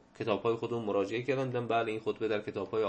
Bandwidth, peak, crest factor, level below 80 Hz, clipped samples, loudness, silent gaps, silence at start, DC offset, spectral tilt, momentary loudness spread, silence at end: 8.6 kHz; -14 dBFS; 18 dB; -72 dBFS; under 0.1%; -33 LUFS; none; 0.2 s; under 0.1%; -7 dB/octave; 3 LU; 0 s